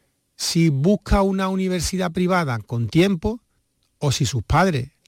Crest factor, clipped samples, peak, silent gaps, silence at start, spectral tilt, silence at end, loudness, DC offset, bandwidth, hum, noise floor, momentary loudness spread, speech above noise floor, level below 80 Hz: 14 dB; under 0.1%; -6 dBFS; none; 0.4 s; -5.5 dB/octave; 0.2 s; -21 LUFS; under 0.1%; 16.5 kHz; none; -68 dBFS; 7 LU; 48 dB; -34 dBFS